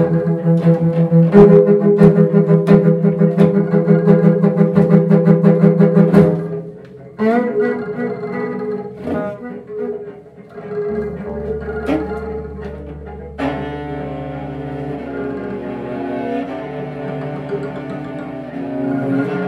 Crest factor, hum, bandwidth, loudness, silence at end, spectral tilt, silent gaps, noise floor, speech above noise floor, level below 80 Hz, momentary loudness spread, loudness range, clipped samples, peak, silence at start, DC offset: 16 dB; none; 4.6 kHz; -15 LUFS; 0 s; -10.5 dB/octave; none; -36 dBFS; 25 dB; -42 dBFS; 17 LU; 13 LU; under 0.1%; 0 dBFS; 0 s; under 0.1%